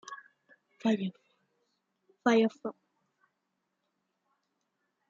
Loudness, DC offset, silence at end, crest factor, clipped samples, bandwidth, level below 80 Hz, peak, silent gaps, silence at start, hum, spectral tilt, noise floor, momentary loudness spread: -30 LUFS; under 0.1%; 2.4 s; 22 dB; under 0.1%; 7.4 kHz; -86 dBFS; -14 dBFS; none; 0.05 s; none; -6 dB/octave; -82 dBFS; 19 LU